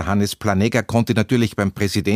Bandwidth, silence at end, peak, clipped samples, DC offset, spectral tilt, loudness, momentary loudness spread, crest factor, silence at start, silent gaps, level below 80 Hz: 15.5 kHz; 0 s; -2 dBFS; under 0.1%; under 0.1%; -6 dB/octave; -19 LUFS; 3 LU; 16 dB; 0 s; none; -44 dBFS